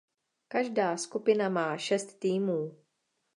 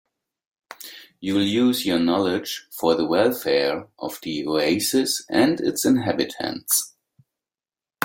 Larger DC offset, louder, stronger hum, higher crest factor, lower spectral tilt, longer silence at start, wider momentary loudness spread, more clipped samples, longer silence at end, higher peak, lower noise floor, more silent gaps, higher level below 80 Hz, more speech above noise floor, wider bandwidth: neither; second, -30 LUFS vs -22 LUFS; neither; about the same, 18 dB vs 20 dB; first, -5 dB/octave vs -3.5 dB/octave; second, 0.5 s vs 0.7 s; second, 6 LU vs 13 LU; neither; second, 0.65 s vs 1.15 s; second, -12 dBFS vs -2 dBFS; second, -79 dBFS vs under -90 dBFS; neither; second, -86 dBFS vs -62 dBFS; second, 50 dB vs over 68 dB; second, 11.5 kHz vs 17 kHz